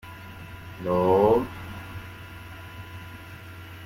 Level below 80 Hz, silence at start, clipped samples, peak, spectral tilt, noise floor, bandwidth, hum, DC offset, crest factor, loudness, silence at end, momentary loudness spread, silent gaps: -52 dBFS; 0.05 s; under 0.1%; -8 dBFS; -7.5 dB/octave; -42 dBFS; 16.5 kHz; none; under 0.1%; 20 dB; -23 LUFS; 0 s; 22 LU; none